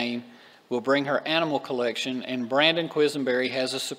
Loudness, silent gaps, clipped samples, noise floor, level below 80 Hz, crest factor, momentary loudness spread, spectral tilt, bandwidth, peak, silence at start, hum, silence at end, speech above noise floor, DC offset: -25 LUFS; none; under 0.1%; -49 dBFS; -80 dBFS; 22 dB; 9 LU; -4 dB/octave; 16 kHz; -4 dBFS; 0 s; none; 0 s; 24 dB; under 0.1%